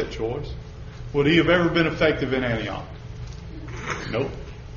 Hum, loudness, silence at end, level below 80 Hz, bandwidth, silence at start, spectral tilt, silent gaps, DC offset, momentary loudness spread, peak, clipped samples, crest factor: none; -23 LUFS; 0 s; -40 dBFS; 7.2 kHz; 0 s; -4.5 dB/octave; none; under 0.1%; 19 LU; -6 dBFS; under 0.1%; 18 dB